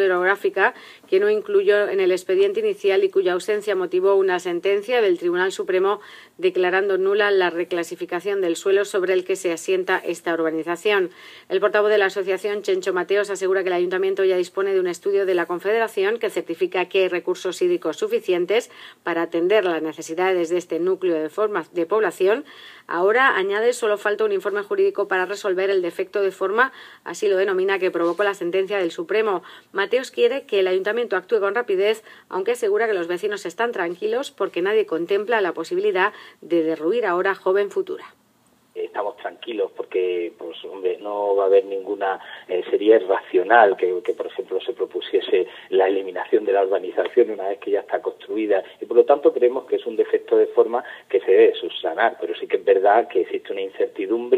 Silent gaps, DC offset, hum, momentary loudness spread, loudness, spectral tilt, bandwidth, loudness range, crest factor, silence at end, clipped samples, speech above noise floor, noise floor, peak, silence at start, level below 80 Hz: none; under 0.1%; none; 9 LU; -21 LUFS; -4 dB/octave; 14.5 kHz; 3 LU; 20 dB; 0 s; under 0.1%; 39 dB; -60 dBFS; 0 dBFS; 0 s; -82 dBFS